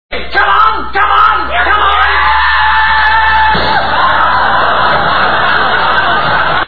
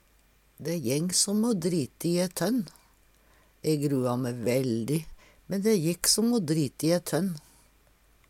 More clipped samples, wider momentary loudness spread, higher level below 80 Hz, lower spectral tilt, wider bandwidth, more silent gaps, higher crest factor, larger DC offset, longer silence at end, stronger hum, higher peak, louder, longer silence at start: first, 0.4% vs under 0.1%; second, 3 LU vs 10 LU; first, -28 dBFS vs -60 dBFS; first, -6 dB/octave vs -4.5 dB/octave; second, 5.4 kHz vs 17.5 kHz; neither; second, 10 dB vs 22 dB; first, 10% vs under 0.1%; second, 0 s vs 0.9 s; neither; first, 0 dBFS vs -6 dBFS; first, -9 LUFS vs -27 LUFS; second, 0.1 s vs 0.6 s